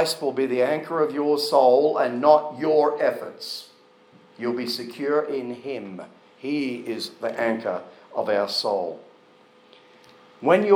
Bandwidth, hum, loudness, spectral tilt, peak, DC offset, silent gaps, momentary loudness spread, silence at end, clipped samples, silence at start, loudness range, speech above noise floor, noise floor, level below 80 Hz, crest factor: 20 kHz; none; -23 LUFS; -4.5 dB/octave; -4 dBFS; under 0.1%; none; 15 LU; 0 s; under 0.1%; 0 s; 8 LU; 32 dB; -54 dBFS; -88 dBFS; 20 dB